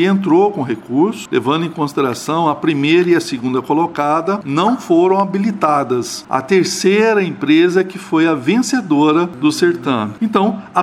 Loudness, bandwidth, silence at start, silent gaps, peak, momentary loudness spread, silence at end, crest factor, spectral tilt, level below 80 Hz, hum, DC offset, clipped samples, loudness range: -15 LUFS; 14.5 kHz; 0 s; none; 0 dBFS; 6 LU; 0 s; 14 dB; -5.5 dB/octave; -62 dBFS; none; under 0.1%; under 0.1%; 2 LU